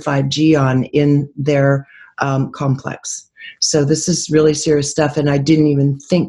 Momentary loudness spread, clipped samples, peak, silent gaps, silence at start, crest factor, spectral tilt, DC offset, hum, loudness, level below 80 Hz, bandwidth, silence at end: 10 LU; under 0.1%; -2 dBFS; none; 0 s; 14 dB; -5.5 dB/octave; under 0.1%; none; -15 LUFS; -48 dBFS; 11.5 kHz; 0 s